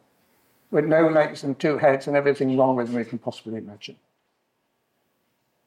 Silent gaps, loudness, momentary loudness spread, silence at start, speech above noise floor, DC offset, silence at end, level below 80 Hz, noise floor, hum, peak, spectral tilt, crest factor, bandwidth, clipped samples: none; -22 LUFS; 16 LU; 0.7 s; 51 dB; under 0.1%; 1.75 s; -74 dBFS; -73 dBFS; none; -8 dBFS; -7 dB/octave; 18 dB; 11.5 kHz; under 0.1%